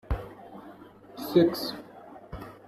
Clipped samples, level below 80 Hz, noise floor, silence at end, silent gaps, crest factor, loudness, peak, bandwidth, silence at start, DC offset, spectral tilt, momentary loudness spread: under 0.1%; -44 dBFS; -49 dBFS; 0.15 s; none; 22 dB; -27 LUFS; -10 dBFS; 14 kHz; 0.1 s; under 0.1%; -6.5 dB/octave; 24 LU